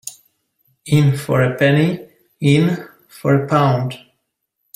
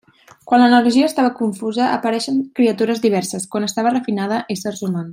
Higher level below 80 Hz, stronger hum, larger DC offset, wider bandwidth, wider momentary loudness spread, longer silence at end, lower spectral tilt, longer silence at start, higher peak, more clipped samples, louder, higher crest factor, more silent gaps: first, -54 dBFS vs -66 dBFS; neither; neither; about the same, 16 kHz vs 16 kHz; about the same, 12 LU vs 10 LU; first, 0.8 s vs 0 s; first, -7 dB/octave vs -5 dB/octave; second, 0.05 s vs 0.45 s; about the same, -2 dBFS vs -2 dBFS; neither; about the same, -17 LUFS vs -17 LUFS; about the same, 16 dB vs 16 dB; neither